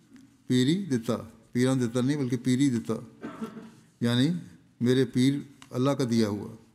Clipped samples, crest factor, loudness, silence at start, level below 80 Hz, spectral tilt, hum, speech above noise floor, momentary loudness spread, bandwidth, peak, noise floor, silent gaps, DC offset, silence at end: under 0.1%; 16 dB; -27 LUFS; 0.15 s; -68 dBFS; -6.5 dB/octave; none; 27 dB; 12 LU; 14.5 kHz; -10 dBFS; -53 dBFS; none; under 0.1%; 0.2 s